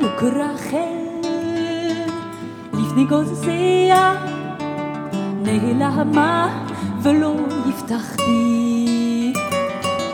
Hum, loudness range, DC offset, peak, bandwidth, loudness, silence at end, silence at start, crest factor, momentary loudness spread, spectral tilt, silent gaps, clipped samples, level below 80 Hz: none; 3 LU; under 0.1%; -2 dBFS; 18.5 kHz; -19 LUFS; 0 s; 0 s; 16 dB; 10 LU; -5.5 dB/octave; none; under 0.1%; -60 dBFS